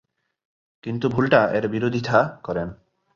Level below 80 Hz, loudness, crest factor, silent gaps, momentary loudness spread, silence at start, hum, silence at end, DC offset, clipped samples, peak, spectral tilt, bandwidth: -54 dBFS; -22 LUFS; 20 dB; none; 13 LU; 0.85 s; none; 0.4 s; under 0.1%; under 0.1%; -2 dBFS; -7.5 dB/octave; 7.4 kHz